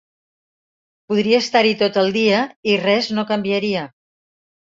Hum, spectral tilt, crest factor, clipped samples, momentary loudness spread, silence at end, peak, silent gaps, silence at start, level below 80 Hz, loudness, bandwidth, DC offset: none; -5 dB/octave; 18 dB; under 0.1%; 7 LU; 0.8 s; -2 dBFS; 2.56-2.63 s; 1.1 s; -62 dBFS; -18 LUFS; 7.8 kHz; under 0.1%